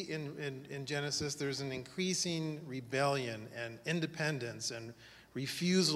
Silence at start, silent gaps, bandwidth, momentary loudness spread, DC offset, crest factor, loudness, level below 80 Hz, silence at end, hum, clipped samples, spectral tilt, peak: 0 s; none; 15.5 kHz; 11 LU; under 0.1%; 18 dB; -37 LUFS; -72 dBFS; 0 s; none; under 0.1%; -4 dB/octave; -18 dBFS